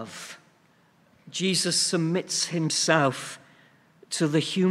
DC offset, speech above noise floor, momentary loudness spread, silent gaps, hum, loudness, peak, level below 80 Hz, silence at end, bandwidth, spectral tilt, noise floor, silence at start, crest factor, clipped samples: under 0.1%; 36 dB; 17 LU; none; none; -25 LUFS; -4 dBFS; -74 dBFS; 0 s; 15 kHz; -3.5 dB/octave; -61 dBFS; 0 s; 22 dB; under 0.1%